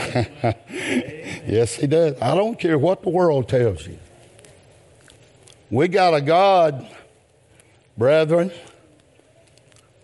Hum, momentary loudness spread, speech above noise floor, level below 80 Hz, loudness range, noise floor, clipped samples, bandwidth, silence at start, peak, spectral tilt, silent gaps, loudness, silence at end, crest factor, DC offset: none; 11 LU; 36 dB; -56 dBFS; 4 LU; -55 dBFS; under 0.1%; 11.5 kHz; 0 s; -6 dBFS; -6 dB/octave; none; -19 LUFS; 1.4 s; 16 dB; under 0.1%